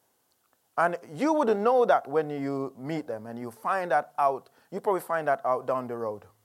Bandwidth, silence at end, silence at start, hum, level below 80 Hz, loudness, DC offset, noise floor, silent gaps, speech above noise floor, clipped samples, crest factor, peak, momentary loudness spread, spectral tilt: 15.5 kHz; 0.25 s; 0.75 s; none; -84 dBFS; -28 LUFS; under 0.1%; -71 dBFS; none; 43 dB; under 0.1%; 18 dB; -10 dBFS; 13 LU; -6.5 dB/octave